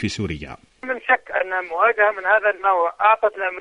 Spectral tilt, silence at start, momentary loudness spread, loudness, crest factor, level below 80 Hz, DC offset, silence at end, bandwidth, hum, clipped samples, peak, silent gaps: -5 dB/octave; 0 s; 12 LU; -19 LUFS; 16 dB; -50 dBFS; under 0.1%; 0 s; 10.5 kHz; none; under 0.1%; -4 dBFS; none